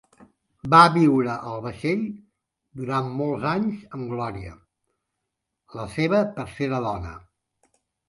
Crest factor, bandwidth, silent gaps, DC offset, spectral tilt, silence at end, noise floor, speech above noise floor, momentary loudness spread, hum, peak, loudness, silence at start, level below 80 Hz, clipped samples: 24 dB; 11.5 kHz; none; under 0.1%; -7 dB/octave; 0.9 s; -82 dBFS; 59 dB; 22 LU; none; 0 dBFS; -23 LUFS; 0.65 s; -52 dBFS; under 0.1%